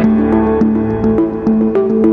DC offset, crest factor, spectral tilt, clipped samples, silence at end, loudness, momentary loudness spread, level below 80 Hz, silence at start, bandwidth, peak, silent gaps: under 0.1%; 12 dB; -10.5 dB/octave; under 0.1%; 0 s; -13 LUFS; 2 LU; -32 dBFS; 0 s; 3.7 kHz; 0 dBFS; none